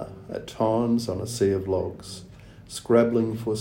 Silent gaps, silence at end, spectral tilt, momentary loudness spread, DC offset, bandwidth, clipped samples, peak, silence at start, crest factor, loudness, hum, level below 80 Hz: none; 0 s; -6.5 dB/octave; 17 LU; under 0.1%; 16.5 kHz; under 0.1%; -6 dBFS; 0 s; 20 dB; -25 LUFS; none; -54 dBFS